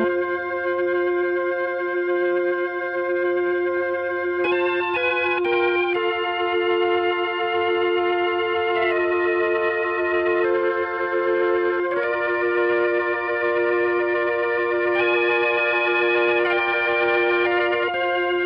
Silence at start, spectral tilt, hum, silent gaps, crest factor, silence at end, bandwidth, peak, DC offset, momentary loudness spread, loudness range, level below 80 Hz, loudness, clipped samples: 0 s; -7 dB/octave; none; none; 12 dB; 0 s; 5.4 kHz; -10 dBFS; under 0.1%; 4 LU; 3 LU; -62 dBFS; -21 LUFS; under 0.1%